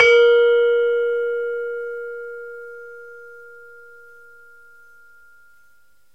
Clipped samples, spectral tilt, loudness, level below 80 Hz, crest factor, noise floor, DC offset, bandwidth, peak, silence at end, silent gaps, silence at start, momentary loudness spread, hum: under 0.1%; -1 dB/octave; -18 LUFS; -66 dBFS; 20 dB; -60 dBFS; 0.3%; 7.4 kHz; -2 dBFS; 2.75 s; none; 0 s; 27 LU; none